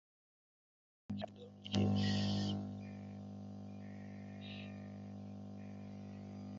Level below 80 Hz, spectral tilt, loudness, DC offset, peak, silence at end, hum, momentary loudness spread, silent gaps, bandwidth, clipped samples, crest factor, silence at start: -64 dBFS; -6 dB/octave; -43 LUFS; under 0.1%; -16 dBFS; 0 s; 50 Hz at -50 dBFS; 15 LU; none; 7.4 kHz; under 0.1%; 26 dB; 1.1 s